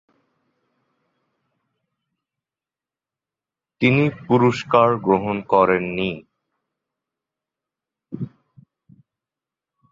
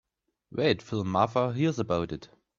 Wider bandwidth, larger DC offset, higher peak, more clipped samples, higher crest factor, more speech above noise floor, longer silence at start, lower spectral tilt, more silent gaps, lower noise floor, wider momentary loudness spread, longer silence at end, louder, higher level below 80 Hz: about the same, 7.6 kHz vs 7.6 kHz; neither; first, -2 dBFS vs -8 dBFS; neither; about the same, 22 dB vs 20 dB; first, over 72 dB vs 32 dB; first, 3.8 s vs 0.5 s; about the same, -7.5 dB/octave vs -6.5 dB/octave; neither; first, under -90 dBFS vs -59 dBFS; first, 16 LU vs 11 LU; first, 1.65 s vs 0.35 s; first, -19 LUFS vs -28 LUFS; about the same, -58 dBFS vs -60 dBFS